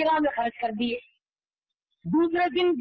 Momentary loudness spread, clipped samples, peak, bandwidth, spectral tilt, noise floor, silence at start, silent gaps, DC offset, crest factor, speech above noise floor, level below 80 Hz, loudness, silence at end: 9 LU; under 0.1%; -16 dBFS; 5.4 kHz; -8 dB/octave; under -90 dBFS; 0 s; none; under 0.1%; 12 dB; over 65 dB; -62 dBFS; -26 LUFS; 0 s